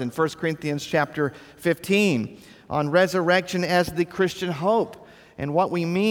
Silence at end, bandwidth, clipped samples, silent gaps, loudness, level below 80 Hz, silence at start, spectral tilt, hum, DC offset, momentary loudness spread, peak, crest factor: 0 s; 19 kHz; under 0.1%; none; -23 LUFS; -58 dBFS; 0 s; -5.5 dB/octave; none; under 0.1%; 8 LU; -6 dBFS; 16 dB